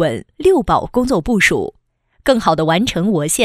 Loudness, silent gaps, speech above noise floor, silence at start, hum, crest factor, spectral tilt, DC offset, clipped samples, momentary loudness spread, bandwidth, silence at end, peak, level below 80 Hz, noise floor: -15 LUFS; none; 42 dB; 0 s; none; 16 dB; -4.5 dB/octave; under 0.1%; under 0.1%; 7 LU; 15.5 kHz; 0 s; 0 dBFS; -36 dBFS; -57 dBFS